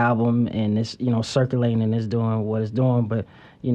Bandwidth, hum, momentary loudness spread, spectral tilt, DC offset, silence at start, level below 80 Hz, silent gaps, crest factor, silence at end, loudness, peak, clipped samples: 9.2 kHz; none; 5 LU; -7.5 dB/octave; under 0.1%; 0 s; -56 dBFS; none; 14 dB; 0 s; -23 LUFS; -8 dBFS; under 0.1%